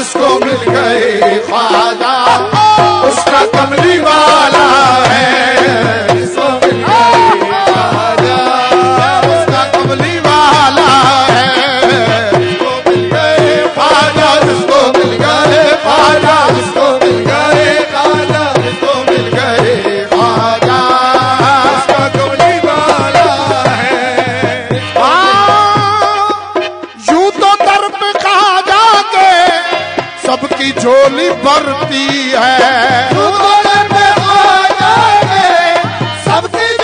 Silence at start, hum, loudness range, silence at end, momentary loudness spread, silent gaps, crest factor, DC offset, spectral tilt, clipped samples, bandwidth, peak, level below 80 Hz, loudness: 0 s; none; 2 LU; 0 s; 6 LU; none; 8 dB; under 0.1%; -4 dB/octave; 0.4%; 10.5 kHz; 0 dBFS; -44 dBFS; -8 LUFS